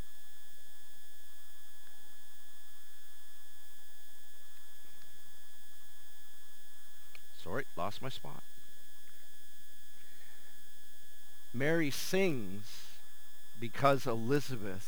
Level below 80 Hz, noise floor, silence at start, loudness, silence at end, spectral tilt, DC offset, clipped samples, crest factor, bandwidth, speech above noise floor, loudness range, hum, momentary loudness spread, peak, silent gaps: -74 dBFS; -60 dBFS; 2.1 s; -36 LUFS; 0 s; -5 dB/octave; 3%; under 0.1%; 28 dB; over 20 kHz; 25 dB; 21 LU; none; 24 LU; -14 dBFS; none